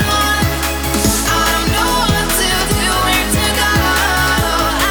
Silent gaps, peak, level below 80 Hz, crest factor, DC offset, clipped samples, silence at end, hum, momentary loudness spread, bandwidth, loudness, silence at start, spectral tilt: none; -2 dBFS; -24 dBFS; 12 dB; under 0.1%; under 0.1%; 0 s; none; 2 LU; over 20 kHz; -13 LUFS; 0 s; -3 dB/octave